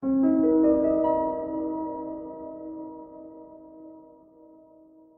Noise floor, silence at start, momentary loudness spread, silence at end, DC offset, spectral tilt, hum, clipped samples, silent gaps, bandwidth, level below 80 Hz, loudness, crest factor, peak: -54 dBFS; 0 s; 26 LU; 1.1 s; under 0.1%; -11.5 dB/octave; none; under 0.1%; none; 3.1 kHz; -58 dBFS; -25 LUFS; 16 dB; -12 dBFS